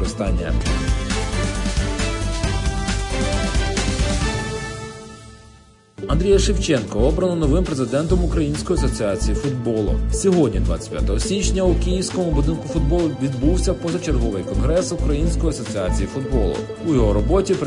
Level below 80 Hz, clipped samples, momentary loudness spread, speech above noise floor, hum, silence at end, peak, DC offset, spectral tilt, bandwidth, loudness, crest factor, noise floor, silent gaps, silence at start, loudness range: -24 dBFS; under 0.1%; 6 LU; 30 dB; none; 0 s; -4 dBFS; under 0.1%; -5.5 dB/octave; 11 kHz; -21 LUFS; 16 dB; -48 dBFS; none; 0 s; 3 LU